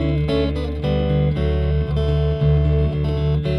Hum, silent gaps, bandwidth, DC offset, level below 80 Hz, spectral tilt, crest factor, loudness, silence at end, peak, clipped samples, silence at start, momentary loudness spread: none; none; 5.6 kHz; under 0.1%; -24 dBFS; -9.5 dB/octave; 12 dB; -20 LUFS; 0 s; -6 dBFS; under 0.1%; 0 s; 3 LU